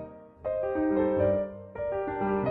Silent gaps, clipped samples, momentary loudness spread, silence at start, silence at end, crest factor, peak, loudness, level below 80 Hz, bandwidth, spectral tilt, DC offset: none; under 0.1%; 12 LU; 0 s; 0 s; 14 dB; -14 dBFS; -29 LUFS; -52 dBFS; 4 kHz; -11 dB/octave; under 0.1%